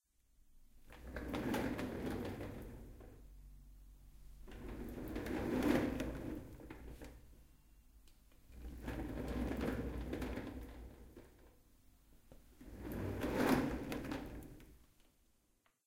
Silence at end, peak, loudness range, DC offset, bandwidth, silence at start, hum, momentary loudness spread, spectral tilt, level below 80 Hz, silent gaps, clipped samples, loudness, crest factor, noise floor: 1 s; -20 dBFS; 8 LU; under 0.1%; 16.5 kHz; 0.45 s; none; 25 LU; -6.5 dB/octave; -54 dBFS; none; under 0.1%; -42 LUFS; 24 dB; -77 dBFS